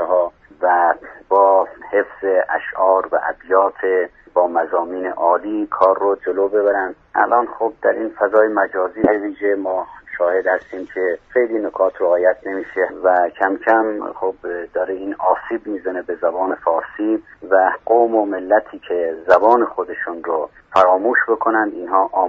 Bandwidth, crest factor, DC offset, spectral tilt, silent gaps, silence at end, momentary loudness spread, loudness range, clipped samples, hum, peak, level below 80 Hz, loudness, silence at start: 6.6 kHz; 18 dB; under 0.1%; -3.5 dB/octave; none; 0 s; 9 LU; 3 LU; under 0.1%; none; 0 dBFS; -56 dBFS; -18 LUFS; 0 s